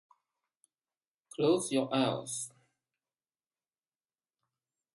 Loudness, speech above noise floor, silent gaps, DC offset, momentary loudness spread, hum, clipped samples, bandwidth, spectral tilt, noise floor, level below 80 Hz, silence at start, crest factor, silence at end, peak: -32 LUFS; over 59 dB; none; under 0.1%; 13 LU; none; under 0.1%; 11.5 kHz; -4.5 dB/octave; under -90 dBFS; -82 dBFS; 1.4 s; 22 dB; 2.45 s; -16 dBFS